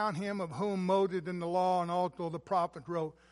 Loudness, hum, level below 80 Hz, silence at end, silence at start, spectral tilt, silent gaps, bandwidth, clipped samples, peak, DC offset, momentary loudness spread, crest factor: -33 LUFS; none; -70 dBFS; 0.2 s; 0 s; -7 dB/octave; none; 11.5 kHz; under 0.1%; -18 dBFS; under 0.1%; 7 LU; 14 dB